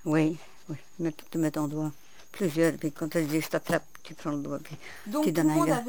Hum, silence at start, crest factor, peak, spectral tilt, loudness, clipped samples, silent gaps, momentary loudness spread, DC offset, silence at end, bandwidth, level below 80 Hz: none; 0.05 s; 18 dB; -12 dBFS; -6 dB/octave; -29 LUFS; under 0.1%; none; 17 LU; 0.5%; 0 s; over 20 kHz; -66 dBFS